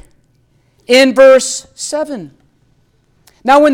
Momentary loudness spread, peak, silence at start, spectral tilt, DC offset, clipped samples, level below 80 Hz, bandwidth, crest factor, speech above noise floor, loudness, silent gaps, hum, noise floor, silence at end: 16 LU; 0 dBFS; 0.9 s; -2 dB/octave; under 0.1%; under 0.1%; -52 dBFS; 15.5 kHz; 12 dB; 45 dB; -11 LUFS; none; none; -55 dBFS; 0 s